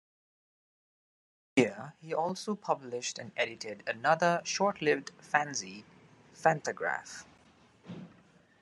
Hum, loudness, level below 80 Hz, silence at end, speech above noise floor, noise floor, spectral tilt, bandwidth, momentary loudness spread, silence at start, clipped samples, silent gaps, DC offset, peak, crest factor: none; -32 LUFS; -78 dBFS; 0.55 s; 30 dB; -62 dBFS; -4 dB/octave; 12 kHz; 18 LU; 1.55 s; under 0.1%; none; under 0.1%; -10 dBFS; 24 dB